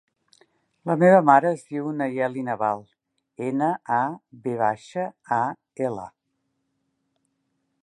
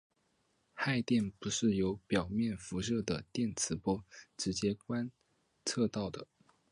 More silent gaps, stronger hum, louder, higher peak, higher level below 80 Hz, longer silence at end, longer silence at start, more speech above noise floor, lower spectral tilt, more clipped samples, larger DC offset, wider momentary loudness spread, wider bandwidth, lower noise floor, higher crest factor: neither; neither; first, -23 LUFS vs -35 LUFS; first, -2 dBFS vs -18 dBFS; second, -72 dBFS vs -60 dBFS; first, 1.75 s vs 0.5 s; about the same, 0.85 s vs 0.75 s; first, 53 dB vs 42 dB; first, -8 dB/octave vs -4.5 dB/octave; neither; neither; first, 16 LU vs 8 LU; about the same, 11.5 kHz vs 11 kHz; about the same, -76 dBFS vs -76 dBFS; about the same, 22 dB vs 18 dB